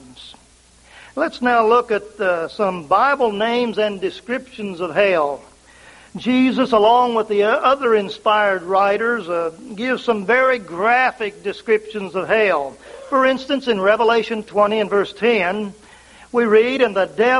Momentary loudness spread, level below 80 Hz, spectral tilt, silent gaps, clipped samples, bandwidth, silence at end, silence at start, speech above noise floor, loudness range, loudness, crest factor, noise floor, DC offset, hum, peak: 11 LU; -56 dBFS; -5 dB/octave; none; under 0.1%; 11.5 kHz; 0 s; 0.1 s; 33 dB; 3 LU; -18 LUFS; 16 dB; -50 dBFS; under 0.1%; none; -2 dBFS